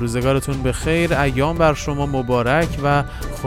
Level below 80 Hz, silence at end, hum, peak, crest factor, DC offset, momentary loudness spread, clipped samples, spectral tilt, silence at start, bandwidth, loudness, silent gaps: -30 dBFS; 0 s; none; -4 dBFS; 16 dB; under 0.1%; 5 LU; under 0.1%; -6 dB/octave; 0 s; 16 kHz; -19 LUFS; none